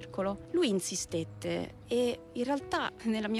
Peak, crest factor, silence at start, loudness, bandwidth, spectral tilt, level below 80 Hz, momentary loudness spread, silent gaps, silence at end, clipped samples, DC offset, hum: -20 dBFS; 14 dB; 0 s; -33 LUFS; 15 kHz; -4 dB/octave; -60 dBFS; 6 LU; none; 0 s; under 0.1%; under 0.1%; none